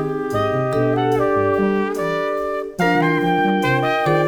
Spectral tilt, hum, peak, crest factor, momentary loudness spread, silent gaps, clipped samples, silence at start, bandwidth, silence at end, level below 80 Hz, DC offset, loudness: -7 dB/octave; none; -4 dBFS; 14 dB; 4 LU; none; under 0.1%; 0 s; 20 kHz; 0 s; -48 dBFS; under 0.1%; -19 LUFS